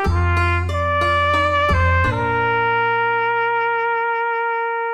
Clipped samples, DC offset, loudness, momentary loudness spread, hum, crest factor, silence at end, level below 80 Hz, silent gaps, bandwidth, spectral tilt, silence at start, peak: under 0.1%; under 0.1%; -18 LUFS; 4 LU; none; 14 dB; 0 s; -32 dBFS; none; 9.2 kHz; -6.5 dB/octave; 0 s; -4 dBFS